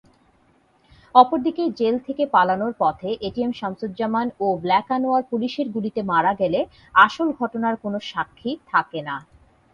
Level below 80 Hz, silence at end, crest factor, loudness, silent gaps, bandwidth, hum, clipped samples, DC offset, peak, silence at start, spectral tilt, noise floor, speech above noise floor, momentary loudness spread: -58 dBFS; 0.5 s; 22 dB; -21 LUFS; none; 7.2 kHz; none; under 0.1%; under 0.1%; 0 dBFS; 1.15 s; -6.5 dB/octave; -60 dBFS; 39 dB; 12 LU